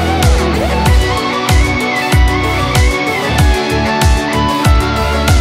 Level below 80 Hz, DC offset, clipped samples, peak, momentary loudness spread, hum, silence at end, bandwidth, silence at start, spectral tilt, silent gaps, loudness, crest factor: -16 dBFS; under 0.1%; under 0.1%; 0 dBFS; 2 LU; none; 0 s; 16 kHz; 0 s; -5 dB/octave; none; -12 LUFS; 10 dB